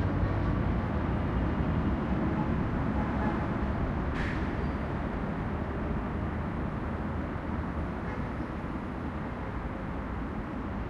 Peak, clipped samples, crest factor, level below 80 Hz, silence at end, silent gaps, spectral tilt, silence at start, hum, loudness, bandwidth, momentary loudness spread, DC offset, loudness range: -16 dBFS; under 0.1%; 14 dB; -38 dBFS; 0 s; none; -9 dB/octave; 0 s; none; -33 LUFS; 7.6 kHz; 6 LU; under 0.1%; 5 LU